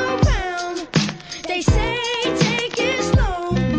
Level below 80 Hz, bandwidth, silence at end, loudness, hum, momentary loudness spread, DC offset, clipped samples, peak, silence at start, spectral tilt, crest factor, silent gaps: -28 dBFS; 9.8 kHz; 0 s; -20 LUFS; none; 7 LU; under 0.1%; under 0.1%; -2 dBFS; 0 s; -5 dB/octave; 18 dB; none